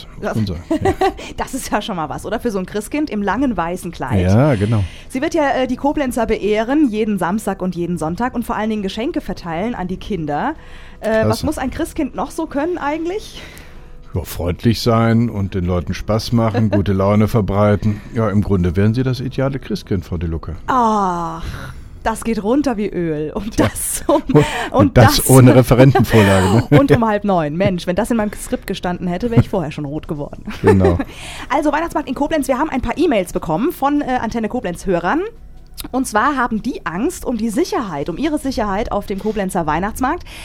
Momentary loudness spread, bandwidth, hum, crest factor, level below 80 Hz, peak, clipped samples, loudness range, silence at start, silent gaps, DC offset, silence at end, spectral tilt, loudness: 12 LU; 18.5 kHz; none; 16 dB; -34 dBFS; 0 dBFS; under 0.1%; 9 LU; 0 s; none; under 0.1%; 0 s; -6 dB/octave; -17 LUFS